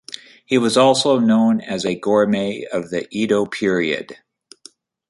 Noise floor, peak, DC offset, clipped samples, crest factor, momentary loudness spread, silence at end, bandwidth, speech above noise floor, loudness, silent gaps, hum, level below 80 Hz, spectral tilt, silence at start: -48 dBFS; -2 dBFS; under 0.1%; under 0.1%; 18 dB; 11 LU; 0.95 s; 11.5 kHz; 31 dB; -18 LUFS; none; none; -60 dBFS; -5 dB/octave; 0.5 s